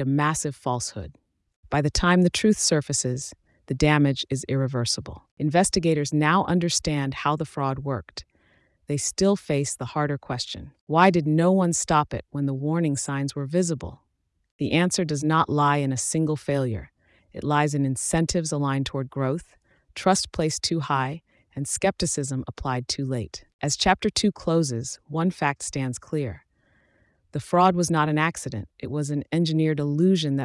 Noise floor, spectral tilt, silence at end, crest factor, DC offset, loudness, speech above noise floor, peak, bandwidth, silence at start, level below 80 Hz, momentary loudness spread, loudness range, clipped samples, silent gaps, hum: -64 dBFS; -5 dB/octave; 0 s; 20 dB; under 0.1%; -24 LUFS; 41 dB; -4 dBFS; 12 kHz; 0 s; -48 dBFS; 12 LU; 4 LU; under 0.1%; 1.56-1.63 s, 5.31-5.37 s, 10.81-10.87 s, 14.51-14.59 s, 23.53-23.59 s; none